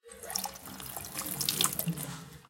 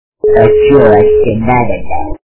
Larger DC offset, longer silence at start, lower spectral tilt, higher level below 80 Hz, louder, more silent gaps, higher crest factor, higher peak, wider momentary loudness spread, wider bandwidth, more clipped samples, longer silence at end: neither; second, 0.05 s vs 0.25 s; second, -2 dB/octave vs -11.5 dB/octave; second, -62 dBFS vs -28 dBFS; second, -33 LUFS vs -8 LUFS; neither; first, 28 dB vs 8 dB; second, -10 dBFS vs 0 dBFS; first, 13 LU vs 10 LU; first, 17 kHz vs 4 kHz; second, under 0.1% vs 1%; about the same, 0 s vs 0.1 s